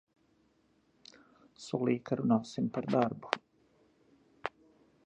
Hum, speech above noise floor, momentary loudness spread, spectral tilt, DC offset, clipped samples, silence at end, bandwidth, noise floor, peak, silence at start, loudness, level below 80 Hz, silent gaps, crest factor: none; 39 dB; 13 LU; -6.5 dB/octave; under 0.1%; under 0.1%; 0.55 s; 8.8 kHz; -71 dBFS; -8 dBFS; 1.6 s; -34 LUFS; -76 dBFS; none; 30 dB